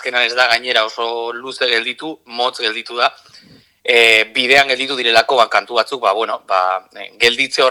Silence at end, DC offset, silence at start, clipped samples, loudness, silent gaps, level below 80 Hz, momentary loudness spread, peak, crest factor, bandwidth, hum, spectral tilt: 0 s; under 0.1%; 0 s; under 0.1%; -14 LUFS; none; -62 dBFS; 12 LU; 0 dBFS; 16 dB; over 20 kHz; none; -1 dB/octave